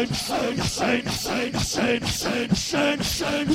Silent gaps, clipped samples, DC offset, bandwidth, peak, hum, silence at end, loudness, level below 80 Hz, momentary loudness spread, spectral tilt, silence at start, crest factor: none; under 0.1%; under 0.1%; 16.5 kHz; -8 dBFS; none; 0 s; -24 LUFS; -42 dBFS; 3 LU; -3.5 dB/octave; 0 s; 16 dB